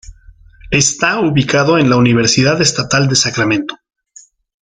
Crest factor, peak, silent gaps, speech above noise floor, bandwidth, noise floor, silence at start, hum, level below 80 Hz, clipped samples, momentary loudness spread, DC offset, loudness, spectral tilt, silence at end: 14 dB; 0 dBFS; none; 32 dB; 9.6 kHz; -44 dBFS; 0.1 s; none; -42 dBFS; under 0.1%; 5 LU; under 0.1%; -12 LUFS; -4 dB/octave; 0.9 s